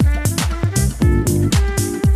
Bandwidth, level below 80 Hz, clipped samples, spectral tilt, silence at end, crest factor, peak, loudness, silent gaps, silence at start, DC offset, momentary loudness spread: 15.5 kHz; -20 dBFS; under 0.1%; -5.5 dB/octave; 0 s; 12 dB; -4 dBFS; -17 LUFS; none; 0 s; under 0.1%; 3 LU